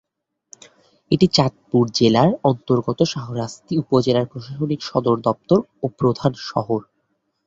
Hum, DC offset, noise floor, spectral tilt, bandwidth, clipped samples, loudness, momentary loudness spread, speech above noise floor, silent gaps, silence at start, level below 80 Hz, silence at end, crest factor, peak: none; under 0.1%; -70 dBFS; -6.5 dB/octave; 7.8 kHz; under 0.1%; -20 LUFS; 10 LU; 51 dB; none; 1.1 s; -54 dBFS; 0.65 s; 18 dB; -2 dBFS